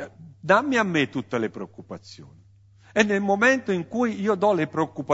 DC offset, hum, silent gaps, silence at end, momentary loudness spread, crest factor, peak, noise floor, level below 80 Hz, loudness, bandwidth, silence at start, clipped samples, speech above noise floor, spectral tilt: under 0.1%; none; none; 0 s; 19 LU; 20 dB; -4 dBFS; -53 dBFS; -66 dBFS; -23 LUFS; 8 kHz; 0 s; under 0.1%; 30 dB; -5.5 dB/octave